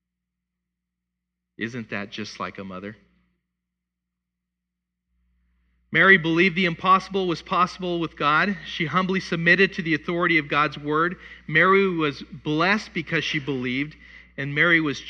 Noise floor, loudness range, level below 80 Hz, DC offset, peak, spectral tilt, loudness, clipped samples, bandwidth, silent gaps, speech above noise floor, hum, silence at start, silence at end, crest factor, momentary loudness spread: -83 dBFS; 15 LU; -56 dBFS; under 0.1%; -2 dBFS; -5.5 dB/octave; -21 LUFS; under 0.1%; 8.8 kHz; none; 60 dB; 60 Hz at -55 dBFS; 1.6 s; 0 s; 22 dB; 16 LU